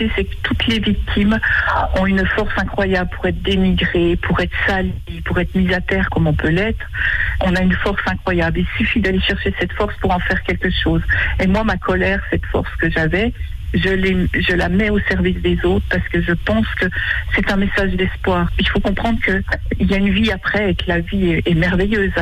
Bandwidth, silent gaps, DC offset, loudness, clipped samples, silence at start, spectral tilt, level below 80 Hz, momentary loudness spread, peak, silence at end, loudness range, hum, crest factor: 10.5 kHz; none; under 0.1%; -17 LUFS; under 0.1%; 0 s; -7 dB/octave; -26 dBFS; 4 LU; -6 dBFS; 0 s; 1 LU; none; 10 dB